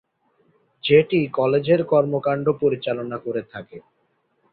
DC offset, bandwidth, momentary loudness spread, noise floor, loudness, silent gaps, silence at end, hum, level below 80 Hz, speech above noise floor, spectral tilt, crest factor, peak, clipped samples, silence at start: under 0.1%; 4.7 kHz; 13 LU; -68 dBFS; -21 LUFS; none; 0.75 s; none; -60 dBFS; 48 dB; -11 dB/octave; 18 dB; -4 dBFS; under 0.1%; 0.85 s